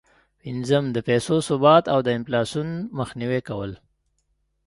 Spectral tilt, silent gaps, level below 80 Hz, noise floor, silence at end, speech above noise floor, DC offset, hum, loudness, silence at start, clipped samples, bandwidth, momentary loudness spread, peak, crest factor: -6 dB/octave; none; -56 dBFS; -70 dBFS; 0.9 s; 49 dB; under 0.1%; none; -22 LUFS; 0.45 s; under 0.1%; 11.5 kHz; 15 LU; -2 dBFS; 20 dB